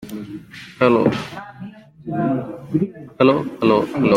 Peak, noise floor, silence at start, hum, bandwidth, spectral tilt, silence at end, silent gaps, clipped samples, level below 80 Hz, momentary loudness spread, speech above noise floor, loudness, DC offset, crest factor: -2 dBFS; -37 dBFS; 0 s; none; 16 kHz; -7.5 dB/octave; 0 s; none; under 0.1%; -56 dBFS; 20 LU; 20 dB; -19 LUFS; under 0.1%; 18 dB